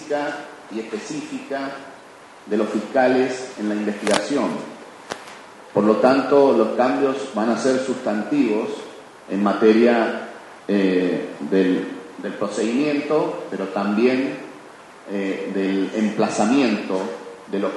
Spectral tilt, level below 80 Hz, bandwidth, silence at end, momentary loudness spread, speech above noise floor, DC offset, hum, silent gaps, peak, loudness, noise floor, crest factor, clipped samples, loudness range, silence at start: -5.5 dB/octave; -68 dBFS; 11.5 kHz; 0 s; 18 LU; 24 dB; under 0.1%; none; none; 0 dBFS; -21 LUFS; -44 dBFS; 20 dB; under 0.1%; 4 LU; 0 s